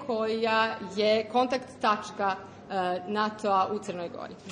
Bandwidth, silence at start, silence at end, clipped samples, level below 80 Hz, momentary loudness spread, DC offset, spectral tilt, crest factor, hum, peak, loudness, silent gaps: 10.5 kHz; 0 s; 0 s; under 0.1%; -70 dBFS; 11 LU; under 0.1%; -4.5 dB/octave; 16 dB; none; -12 dBFS; -28 LUFS; none